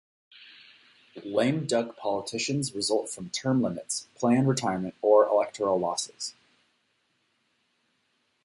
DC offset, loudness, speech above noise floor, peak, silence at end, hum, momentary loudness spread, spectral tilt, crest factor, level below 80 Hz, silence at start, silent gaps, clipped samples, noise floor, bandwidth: under 0.1%; -27 LUFS; 46 dB; -8 dBFS; 2.15 s; none; 11 LU; -5 dB/octave; 20 dB; -68 dBFS; 0.4 s; none; under 0.1%; -73 dBFS; 11.5 kHz